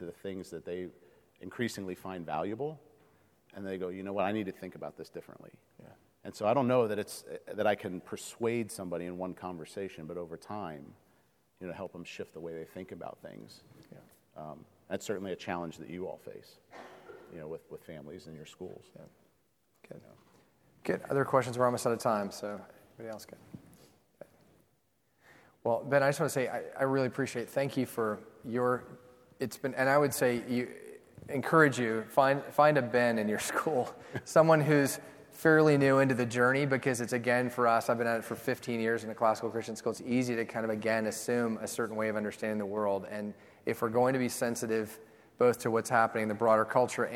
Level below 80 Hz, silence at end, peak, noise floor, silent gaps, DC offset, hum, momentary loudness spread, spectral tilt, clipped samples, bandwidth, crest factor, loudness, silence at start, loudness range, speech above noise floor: -74 dBFS; 0 s; -10 dBFS; -74 dBFS; none; under 0.1%; none; 20 LU; -5.5 dB/octave; under 0.1%; 17.5 kHz; 24 dB; -31 LUFS; 0 s; 17 LU; 43 dB